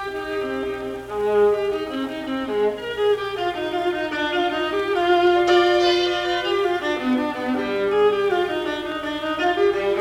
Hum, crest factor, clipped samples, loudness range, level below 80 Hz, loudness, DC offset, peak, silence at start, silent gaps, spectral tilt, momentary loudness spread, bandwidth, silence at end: none; 16 dB; under 0.1%; 4 LU; -52 dBFS; -21 LUFS; under 0.1%; -6 dBFS; 0 s; none; -4.5 dB/octave; 10 LU; 14 kHz; 0 s